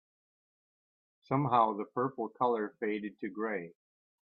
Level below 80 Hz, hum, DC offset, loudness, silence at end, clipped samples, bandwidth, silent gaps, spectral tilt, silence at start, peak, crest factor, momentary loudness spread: -80 dBFS; none; under 0.1%; -33 LUFS; 0.55 s; under 0.1%; 5.4 kHz; none; -10 dB/octave; 1.3 s; -14 dBFS; 22 dB; 11 LU